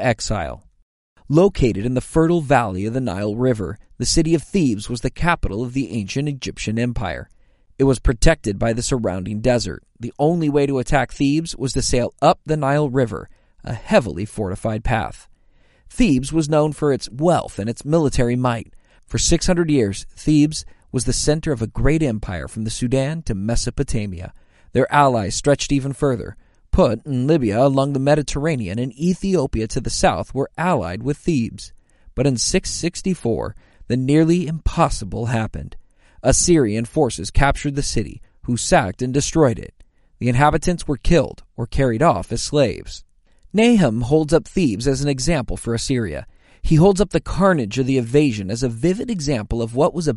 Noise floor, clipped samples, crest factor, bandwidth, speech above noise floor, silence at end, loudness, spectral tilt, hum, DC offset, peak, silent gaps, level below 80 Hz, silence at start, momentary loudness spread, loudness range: -54 dBFS; under 0.1%; 18 dB; 11.5 kHz; 35 dB; 0 s; -19 LUFS; -5.5 dB/octave; none; under 0.1%; -2 dBFS; 0.82-1.16 s; -30 dBFS; 0 s; 10 LU; 3 LU